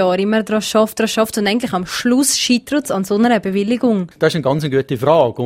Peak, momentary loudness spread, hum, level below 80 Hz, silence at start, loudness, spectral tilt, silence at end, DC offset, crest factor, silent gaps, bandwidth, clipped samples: 0 dBFS; 5 LU; none; -52 dBFS; 0 s; -16 LUFS; -4.5 dB/octave; 0 s; under 0.1%; 16 dB; none; 16 kHz; under 0.1%